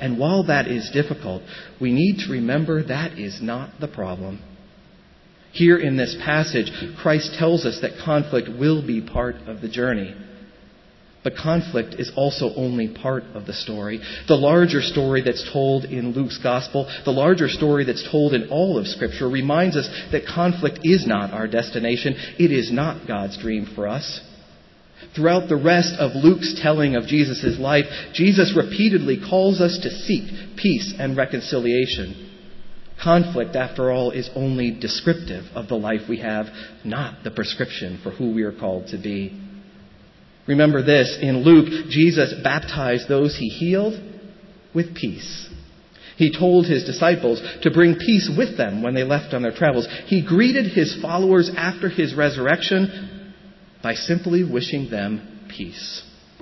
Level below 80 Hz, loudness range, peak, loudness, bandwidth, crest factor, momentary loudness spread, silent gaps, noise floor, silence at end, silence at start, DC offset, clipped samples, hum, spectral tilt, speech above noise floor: -48 dBFS; 7 LU; -2 dBFS; -20 LUFS; 6.2 kHz; 18 dB; 13 LU; none; -51 dBFS; 0.4 s; 0 s; under 0.1%; under 0.1%; none; -6.5 dB/octave; 31 dB